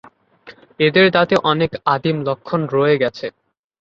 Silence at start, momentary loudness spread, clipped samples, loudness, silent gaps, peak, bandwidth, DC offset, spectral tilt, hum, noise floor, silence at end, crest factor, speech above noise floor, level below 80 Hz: 0.45 s; 9 LU; under 0.1%; -17 LUFS; none; -2 dBFS; 7.6 kHz; under 0.1%; -7 dB/octave; none; -45 dBFS; 0.5 s; 16 dB; 28 dB; -54 dBFS